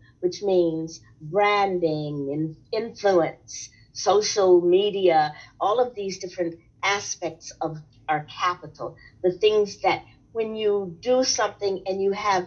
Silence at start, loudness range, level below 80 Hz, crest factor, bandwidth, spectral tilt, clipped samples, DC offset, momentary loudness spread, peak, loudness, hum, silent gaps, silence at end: 0.2 s; 5 LU; -62 dBFS; 16 dB; 7.4 kHz; -4 dB/octave; under 0.1%; under 0.1%; 13 LU; -8 dBFS; -24 LUFS; none; none; 0 s